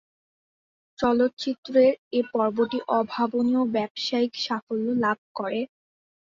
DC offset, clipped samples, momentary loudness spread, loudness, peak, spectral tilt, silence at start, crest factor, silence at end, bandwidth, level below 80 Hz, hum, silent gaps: under 0.1%; under 0.1%; 9 LU; -25 LUFS; -8 dBFS; -5.5 dB/octave; 1 s; 16 dB; 0.65 s; 7.4 kHz; -66 dBFS; none; 1.33-1.37 s, 1.58-1.63 s, 1.98-2.11 s, 3.90-3.95 s, 4.62-4.67 s, 5.18-5.35 s